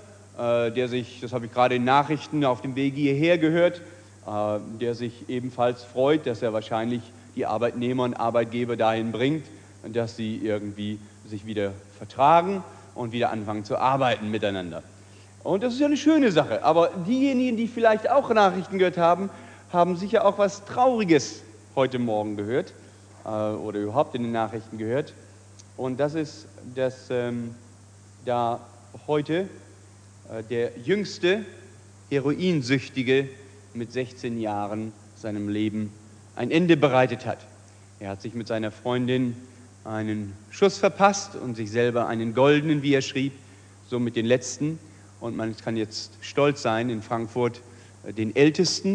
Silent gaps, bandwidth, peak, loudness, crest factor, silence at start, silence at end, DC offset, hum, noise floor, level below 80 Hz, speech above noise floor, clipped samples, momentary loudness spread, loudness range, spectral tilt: none; 10.5 kHz; -4 dBFS; -25 LUFS; 22 dB; 0 s; 0 s; under 0.1%; none; -50 dBFS; -66 dBFS; 25 dB; under 0.1%; 16 LU; 7 LU; -5.5 dB/octave